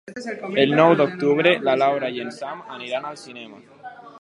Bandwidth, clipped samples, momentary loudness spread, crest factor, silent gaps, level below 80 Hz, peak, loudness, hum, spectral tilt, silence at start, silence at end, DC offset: 11.5 kHz; under 0.1%; 25 LU; 20 dB; none; -72 dBFS; -2 dBFS; -20 LUFS; none; -6 dB/octave; 0.05 s; 0.1 s; under 0.1%